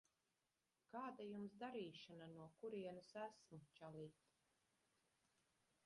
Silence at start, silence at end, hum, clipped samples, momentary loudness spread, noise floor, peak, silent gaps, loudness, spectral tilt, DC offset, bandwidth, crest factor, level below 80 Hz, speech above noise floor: 0.9 s; 1.75 s; none; under 0.1%; 9 LU; under -90 dBFS; -40 dBFS; none; -56 LUFS; -6 dB/octave; under 0.1%; 11 kHz; 18 dB; under -90 dBFS; over 34 dB